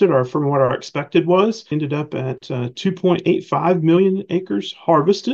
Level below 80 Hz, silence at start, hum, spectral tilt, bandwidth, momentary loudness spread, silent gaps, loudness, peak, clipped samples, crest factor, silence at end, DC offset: -60 dBFS; 0 s; none; -7 dB/octave; 7.6 kHz; 9 LU; none; -18 LUFS; -2 dBFS; under 0.1%; 16 dB; 0 s; under 0.1%